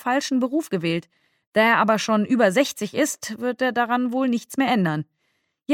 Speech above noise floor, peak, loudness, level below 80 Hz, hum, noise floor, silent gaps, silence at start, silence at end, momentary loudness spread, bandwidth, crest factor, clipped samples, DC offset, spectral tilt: 50 dB; -4 dBFS; -22 LUFS; -72 dBFS; none; -72 dBFS; 1.47-1.52 s; 0.05 s; 0 s; 9 LU; 17 kHz; 18 dB; under 0.1%; under 0.1%; -4.5 dB/octave